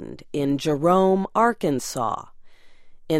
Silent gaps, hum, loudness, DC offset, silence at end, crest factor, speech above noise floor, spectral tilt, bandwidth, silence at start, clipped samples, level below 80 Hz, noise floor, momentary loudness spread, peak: none; none; -22 LUFS; under 0.1%; 0 s; 18 dB; 22 dB; -6 dB/octave; 16 kHz; 0 s; under 0.1%; -54 dBFS; -43 dBFS; 9 LU; -6 dBFS